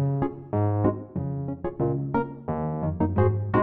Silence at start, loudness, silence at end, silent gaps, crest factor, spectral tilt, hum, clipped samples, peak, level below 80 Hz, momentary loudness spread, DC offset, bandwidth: 0 s; -27 LUFS; 0 s; none; 18 dB; -13 dB/octave; none; under 0.1%; -8 dBFS; -46 dBFS; 8 LU; under 0.1%; 3.7 kHz